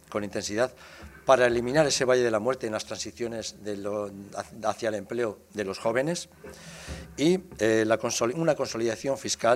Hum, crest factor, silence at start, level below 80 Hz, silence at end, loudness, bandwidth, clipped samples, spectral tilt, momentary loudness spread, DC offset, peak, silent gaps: none; 20 dB; 0.1 s; -56 dBFS; 0 s; -27 LUFS; 16 kHz; under 0.1%; -4 dB/octave; 15 LU; under 0.1%; -6 dBFS; none